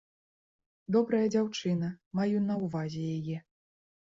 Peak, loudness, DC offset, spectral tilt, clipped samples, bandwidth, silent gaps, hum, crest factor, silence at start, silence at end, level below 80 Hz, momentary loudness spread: -16 dBFS; -31 LUFS; under 0.1%; -7 dB/octave; under 0.1%; 7.6 kHz; 2.06-2.11 s; none; 16 dB; 0.9 s; 0.75 s; -70 dBFS; 9 LU